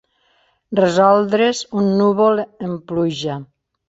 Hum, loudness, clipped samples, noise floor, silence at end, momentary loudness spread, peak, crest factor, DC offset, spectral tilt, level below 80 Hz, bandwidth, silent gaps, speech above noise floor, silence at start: none; -17 LUFS; under 0.1%; -61 dBFS; 0.45 s; 13 LU; -2 dBFS; 16 dB; under 0.1%; -6 dB/octave; -58 dBFS; 8 kHz; none; 44 dB; 0.7 s